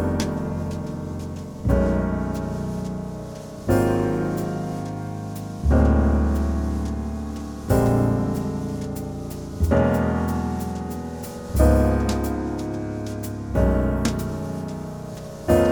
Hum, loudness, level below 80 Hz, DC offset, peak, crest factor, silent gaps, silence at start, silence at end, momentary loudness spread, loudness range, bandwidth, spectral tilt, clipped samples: none; -24 LUFS; -28 dBFS; under 0.1%; -4 dBFS; 20 dB; none; 0 s; 0 s; 12 LU; 3 LU; over 20 kHz; -7.5 dB/octave; under 0.1%